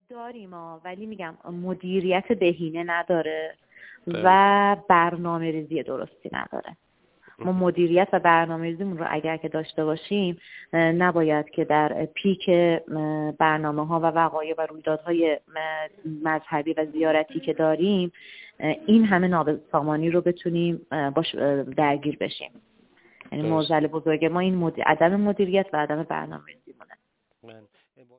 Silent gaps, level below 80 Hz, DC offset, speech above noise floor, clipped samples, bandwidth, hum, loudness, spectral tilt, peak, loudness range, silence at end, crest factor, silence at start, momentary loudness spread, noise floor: none; -64 dBFS; under 0.1%; 44 dB; under 0.1%; 4 kHz; none; -24 LUFS; -10 dB/octave; -4 dBFS; 4 LU; 0.6 s; 20 dB; 0.1 s; 15 LU; -68 dBFS